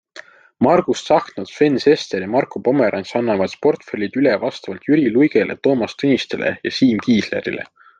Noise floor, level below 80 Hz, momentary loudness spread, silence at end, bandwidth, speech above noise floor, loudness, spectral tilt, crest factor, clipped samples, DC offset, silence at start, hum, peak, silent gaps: -42 dBFS; -60 dBFS; 8 LU; 0.35 s; 9 kHz; 25 dB; -18 LUFS; -6 dB/octave; 16 dB; under 0.1%; under 0.1%; 0.15 s; none; -2 dBFS; none